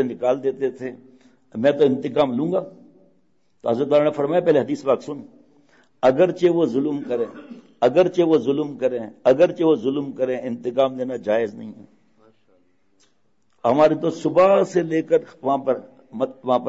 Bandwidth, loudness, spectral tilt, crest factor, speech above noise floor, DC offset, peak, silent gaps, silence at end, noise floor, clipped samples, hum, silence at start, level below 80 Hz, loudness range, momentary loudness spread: 8 kHz; -20 LUFS; -7 dB/octave; 16 dB; 48 dB; under 0.1%; -6 dBFS; none; 0 s; -68 dBFS; under 0.1%; none; 0 s; -64 dBFS; 4 LU; 11 LU